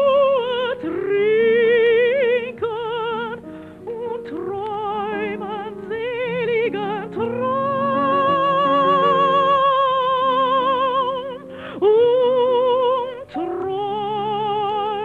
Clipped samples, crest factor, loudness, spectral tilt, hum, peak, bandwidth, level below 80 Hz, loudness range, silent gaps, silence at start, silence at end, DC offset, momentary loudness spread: under 0.1%; 12 dB; -19 LUFS; -6.5 dB/octave; none; -8 dBFS; 6.8 kHz; -58 dBFS; 8 LU; none; 0 s; 0 s; under 0.1%; 12 LU